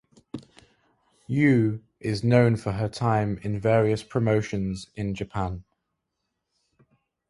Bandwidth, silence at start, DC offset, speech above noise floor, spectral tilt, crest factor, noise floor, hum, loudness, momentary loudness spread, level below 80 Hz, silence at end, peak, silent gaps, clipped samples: 11.5 kHz; 0.35 s; under 0.1%; 57 dB; -7.5 dB/octave; 22 dB; -80 dBFS; none; -25 LUFS; 13 LU; -50 dBFS; 1.7 s; -6 dBFS; none; under 0.1%